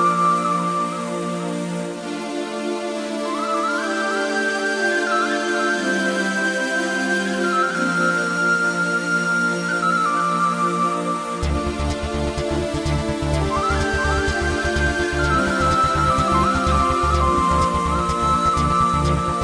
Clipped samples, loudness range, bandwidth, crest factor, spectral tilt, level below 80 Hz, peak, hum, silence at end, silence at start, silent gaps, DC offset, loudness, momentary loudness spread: under 0.1%; 5 LU; 10.5 kHz; 14 dB; -5 dB/octave; -32 dBFS; -6 dBFS; none; 0 s; 0 s; none; under 0.1%; -20 LUFS; 7 LU